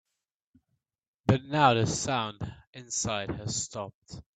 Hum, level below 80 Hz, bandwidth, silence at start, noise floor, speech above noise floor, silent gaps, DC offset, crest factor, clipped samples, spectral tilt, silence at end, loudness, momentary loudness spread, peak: none; -56 dBFS; 9.4 kHz; 1.25 s; -86 dBFS; 56 dB; 2.67-2.73 s, 3.94-4.02 s; under 0.1%; 24 dB; under 0.1%; -4 dB/octave; 0.15 s; -28 LUFS; 18 LU; -6 dBFS